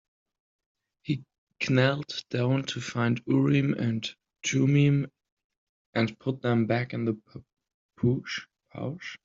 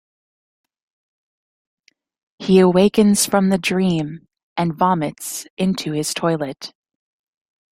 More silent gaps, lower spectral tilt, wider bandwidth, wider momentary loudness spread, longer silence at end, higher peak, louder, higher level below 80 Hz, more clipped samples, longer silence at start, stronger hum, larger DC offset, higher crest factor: first, 1.38-1.47 s, 5.32-5.37 s, 5.44-5.50 s, 5.57-5.93 s, 7.74-7.89 s vs 4.43-4.56 s, 5.50-5.57 s; about the same, -6 dB/octave vs -5 dB/octave; second, 7.6 kHz vs 16 kHz; about the same, 13 LU vs 15 LU; second, 0.1 s vs 1.05 s; second, -8 dBFS vs -2 dBFS; second, -28 LUFS vs -18 LUFS; second, -64 dBFS vs -56 dBFS; neither; second, 1.05 s vs 2.4 s; neither; neither; about the same, 20 dB vs 18 dB